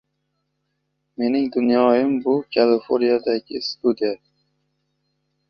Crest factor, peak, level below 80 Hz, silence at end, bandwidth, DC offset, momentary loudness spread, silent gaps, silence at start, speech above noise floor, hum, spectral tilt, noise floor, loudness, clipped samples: 18 dB; -4 dBFS; -66 dBFS; 1.35 s; 6.6 kHz; under 0.1%; 9 LU; none; 1.2 s; 55 dB; none; -6.5 dB/octave; -74 dBFS; -20 LUFS; under 0.1%